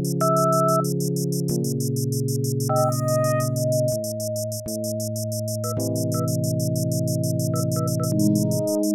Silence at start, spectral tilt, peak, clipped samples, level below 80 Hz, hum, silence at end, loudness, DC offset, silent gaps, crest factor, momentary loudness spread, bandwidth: 0 s; -6 dB/octave; -8 dBFS; under 0.1%; -62 dBFS; none; 0 s; -23 LUFS; under 0.1%; none; 14 dB; 7 LU; 18 kHz